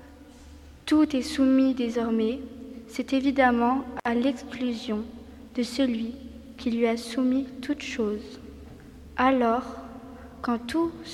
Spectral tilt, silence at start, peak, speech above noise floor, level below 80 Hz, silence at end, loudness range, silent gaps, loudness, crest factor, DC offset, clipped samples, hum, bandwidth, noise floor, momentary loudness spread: -5 dB/octave; 0 s; -8 dBFS; 23 dB; -52 dBFS; 0 s; 4 LU; none; -26 LUFS; 20 dB; under 0.1%; under 0.1%; none; 12.5 kHz; -48 dBFS; 21 LU